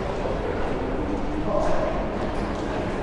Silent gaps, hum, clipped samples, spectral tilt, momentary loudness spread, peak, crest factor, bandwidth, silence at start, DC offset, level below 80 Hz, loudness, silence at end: none; none; under 0.1%; -7 dB/octave; 3 LU; -10 dBFS; 16 dB; 10.5 kHz; 0 s; under 0.1%; -32 dBFS; -27 LUFS; 0 s